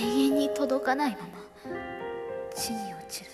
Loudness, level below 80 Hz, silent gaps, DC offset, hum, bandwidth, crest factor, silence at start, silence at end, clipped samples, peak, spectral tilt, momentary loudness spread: -30 LUFS; -62 dBFS; none; under 0.1%; none; 15 kHz; 18 dB; 0 s; 0 s; under 0.1%; -12 dBFS; -3.5 dB/octave; 15 LU